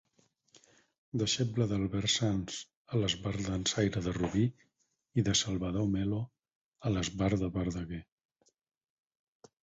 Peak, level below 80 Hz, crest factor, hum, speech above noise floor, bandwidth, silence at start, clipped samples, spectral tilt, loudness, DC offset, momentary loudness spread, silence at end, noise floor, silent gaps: -14 dBFS; -52 dBFS; 20 dB; none; 40 dB; 8.2 kHz; 1.15 s; under 0.1%; -4.5 dB/octave; -33 LUFS; under 0.1%; 10 LU; 1.6 s; -72 dBFS; 2.76-2.85 s, 6.55-6.72 s